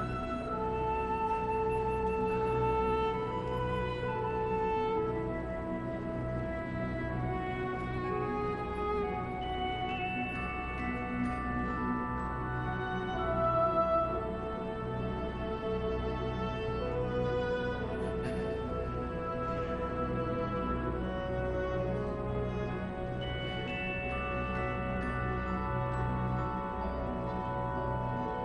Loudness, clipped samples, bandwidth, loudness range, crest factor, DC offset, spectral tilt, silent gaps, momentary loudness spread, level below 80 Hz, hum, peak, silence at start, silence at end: -34 LUFS; under 0.1%; 11 kHz; 3 LU; 16 dB; under 0.1%; -8 dB/octave; none; 5 LU; -44 dBFS; none; -18 dBFS; 0 s; 0 s